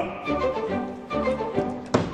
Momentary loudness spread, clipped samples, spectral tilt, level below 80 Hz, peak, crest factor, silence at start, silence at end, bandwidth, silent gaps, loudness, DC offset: 4 LU; under 0.1%; -6.5 dB/octave; -46 dBFS; -2 dBFS; 24 dB; 0 s; 0 s; 10 kHz; none; -27 LUFS; under 0.1%